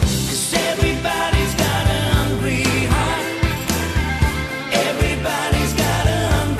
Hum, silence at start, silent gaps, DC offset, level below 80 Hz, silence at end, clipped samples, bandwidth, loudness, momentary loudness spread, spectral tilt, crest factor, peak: none; 0 s; none; under 0.1%; -26 dBFS; 0 s; under 0.1%; 14 kHz; -19 LUFS; 3 LU; -4.5 dB/octave; 16 dB; -2 dBFS